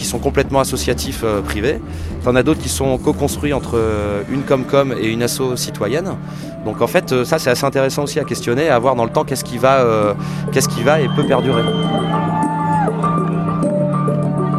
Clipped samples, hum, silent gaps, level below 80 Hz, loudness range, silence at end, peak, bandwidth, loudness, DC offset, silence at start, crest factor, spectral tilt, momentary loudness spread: under 0.1%; none; none; -34 dBFS; 3 LU; 0 s; 0 dBFS; 14.5 kHz; -17 LUFS; under 0.1%; 0 s; 16 dB; -5.5 dB/octave; 6 LU